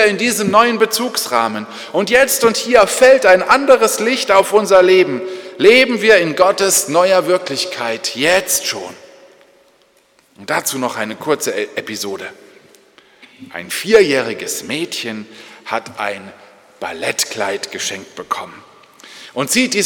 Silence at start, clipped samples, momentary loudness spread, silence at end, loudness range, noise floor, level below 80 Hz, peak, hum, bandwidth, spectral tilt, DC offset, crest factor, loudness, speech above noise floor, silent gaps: 0 s; under 0.1%; 16 LU; 0 s; 11 LU; -54 dBFS; -54 dBFS; 0 dBFS; none; 19 kHz; -2.5 dB/octave; under 0.1%; 16 dB; -14 LUFS; 40 dB; none